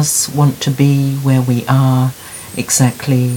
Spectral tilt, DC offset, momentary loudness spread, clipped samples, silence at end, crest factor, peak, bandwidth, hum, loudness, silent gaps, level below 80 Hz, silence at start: -5 dB/octave; under 0.1%; 7 LU; under 0.1%; 0 s; 14 dB; 0 dBFS; 18.5 kHz; none; -14 LUFS; none; -50 dBFS; 0 s